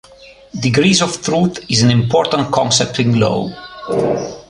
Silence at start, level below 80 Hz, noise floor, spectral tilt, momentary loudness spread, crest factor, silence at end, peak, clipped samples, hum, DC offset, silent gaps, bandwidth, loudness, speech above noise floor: 0.2 s; -46 dBFS; -42 dBFS; -4.5 dB/octave; 9 LU; 14 dB; 0.1 s; 0 dBFS; under 0.1%; none; under 0.1%; none; 11 kHz; -15 LUFS; 27 dB